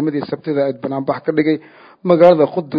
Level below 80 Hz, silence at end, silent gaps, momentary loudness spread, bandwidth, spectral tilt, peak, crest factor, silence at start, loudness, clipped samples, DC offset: -62 dBFS; 0 s; none; 12 LU; 5.2 kHz; -9.5 dB/octave; 0 dBFS; 16 dB; 0 s; -16 LUFS; 0.2%; under 0.1%